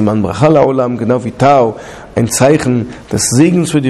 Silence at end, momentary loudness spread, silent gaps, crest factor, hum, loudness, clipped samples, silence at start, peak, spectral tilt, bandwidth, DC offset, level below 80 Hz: 0 s; 8 LU; none; 10 dB; none; -11 LUFS; under 0.1%; 0 s; 0 dBFS; -5.5 dB/octave; 14 kHz; under 0.1%; -40 dBFS